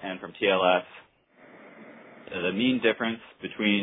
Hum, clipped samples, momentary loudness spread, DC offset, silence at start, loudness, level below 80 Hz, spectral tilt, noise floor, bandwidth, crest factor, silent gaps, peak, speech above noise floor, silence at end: none; under 0.1%; 25 LU; under 0.1%; 0 s; -26 LUFS; -70 dBFS; -8.5 dB/octave; -56 dBFS; 4 kHz; 20 dB; none; -8 dBFS; 30 dB; 0 s